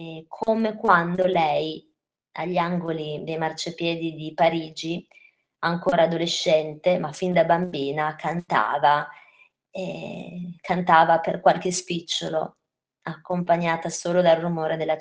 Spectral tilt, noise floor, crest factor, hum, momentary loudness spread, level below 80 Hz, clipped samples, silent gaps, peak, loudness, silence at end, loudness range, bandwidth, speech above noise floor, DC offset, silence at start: -5 dB/octave; -58 dBFS; 22 dB; none; 15 LU; -64 dBFS; under 0.1%; none; -2 dBFS; -23 LUFS; 0 s; 4 LU; 9.8 kHz; 35 dB; under 0.1%; 0 s